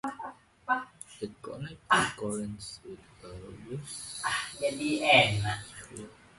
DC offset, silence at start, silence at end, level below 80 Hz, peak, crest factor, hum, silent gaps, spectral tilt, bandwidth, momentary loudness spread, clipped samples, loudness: under 0.1%; 0.05 s; 0.25 s; -58 dBFS; -8 dBFS; 24 dB; none; none; -3.5 dB/octave; 11.5 kHz; 24 LU; under 0.1%; -28 LUFS